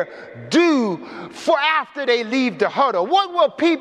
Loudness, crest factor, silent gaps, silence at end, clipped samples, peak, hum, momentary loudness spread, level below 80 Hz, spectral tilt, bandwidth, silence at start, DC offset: -18 LUFS; 14 dB; none; 0 s; under 0.1%; -4 dBFS; none; 11 LU; -70 dBFS; -4.5 dB/octave; 10.5 kHz; 0 s; under 0.1%